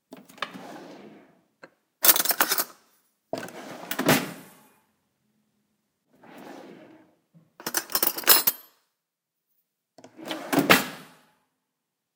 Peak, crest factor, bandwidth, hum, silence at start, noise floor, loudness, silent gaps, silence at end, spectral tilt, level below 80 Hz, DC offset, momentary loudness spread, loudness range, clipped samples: 0 dBFS; 30 dB; 19 kHz; none; 0.1 s; -84 dBFS; -21 LUFS; none; 1.15 s; -2 dB/octave; -74 dBFS; under 0.1%; 26 LU; 7 LU; under 0.1%